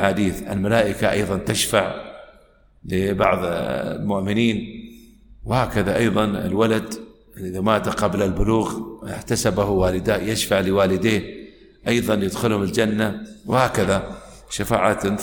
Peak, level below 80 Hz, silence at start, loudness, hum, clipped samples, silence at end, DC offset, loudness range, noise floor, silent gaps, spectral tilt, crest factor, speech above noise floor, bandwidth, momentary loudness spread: -2 dBFS; -40 dBFS; 0 s; -21 LUFS; none; under 0.1%; 0 s; under 0.1%; 2 LU; -53 dBFS; none; -5 dB/octave; 18 dB; 33 dB; 19 kHz; 13 LU